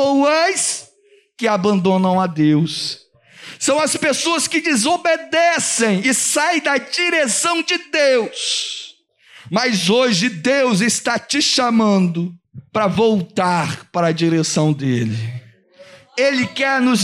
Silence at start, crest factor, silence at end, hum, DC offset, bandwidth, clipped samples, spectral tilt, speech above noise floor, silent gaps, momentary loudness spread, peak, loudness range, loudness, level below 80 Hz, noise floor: 0 s; 14 dB; 0 s; none; under 0.1%; 15 kHz; under 0.1%; -3.5 dB/octave; 37 dB; none; 8 LU; -4 dBFS; 3 LU; -17 LUFS; -62 dBFS; -54 dBFS